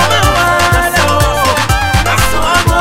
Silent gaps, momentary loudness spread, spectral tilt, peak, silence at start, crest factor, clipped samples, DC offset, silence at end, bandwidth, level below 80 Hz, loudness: none; 2 LU; -3.5 dB/octave; 0 dBFS; 0 s; 10 dB; under 0.1%; under 0.1%; 0 s; 16.5 kHz; -20 dBFS; -10 LUFS